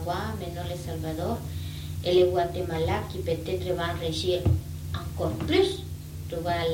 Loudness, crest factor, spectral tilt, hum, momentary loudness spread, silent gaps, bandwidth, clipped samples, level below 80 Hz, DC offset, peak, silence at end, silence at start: -28 LUFS; 16 dB; -6 dB/octave; none; 11 LU; none; 17 kHz; under 0.1%; -44 dBFS; under 0.1%; -10 dBFS; 0 s; 0 s